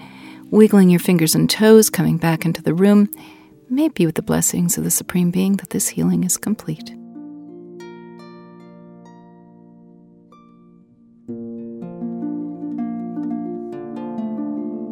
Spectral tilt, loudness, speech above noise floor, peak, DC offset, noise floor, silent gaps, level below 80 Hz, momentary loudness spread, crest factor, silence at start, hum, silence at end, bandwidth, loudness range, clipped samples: -5 dB/octave; -18 LUFS; 34 dB; 0 dBFS; under 0.1%; -50 dBFS; none; -56 dBFS; 24 LU; 20 dB; 0 s; none; 0 s; 19 kHz; 22 LU; under 0.1%